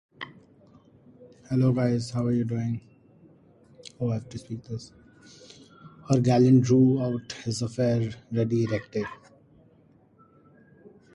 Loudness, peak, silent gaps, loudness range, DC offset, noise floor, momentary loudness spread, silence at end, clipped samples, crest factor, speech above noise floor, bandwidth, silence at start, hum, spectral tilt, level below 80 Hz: -26 LUFS; -8 dBFS; none; 10 LU; under 0.1%; -59 dBFS; 19 LU; 2 s; under 0.1%; 18 dB; 35 dB; 11 kHz; 0.2 s; none; -7.5 dB/octave; -60 dBFS